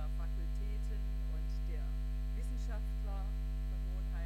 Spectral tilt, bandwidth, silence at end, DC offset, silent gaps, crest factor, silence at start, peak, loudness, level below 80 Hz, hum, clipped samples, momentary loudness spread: -7 dB/octave; 8.6 kHz; 0 s; under 0.1%; none; 6 dB; 0 s; -30 dBFS; -41 LUFS; -36 dBFS; 50 Hz at -35 dBFS; under 0.1%; 0 LU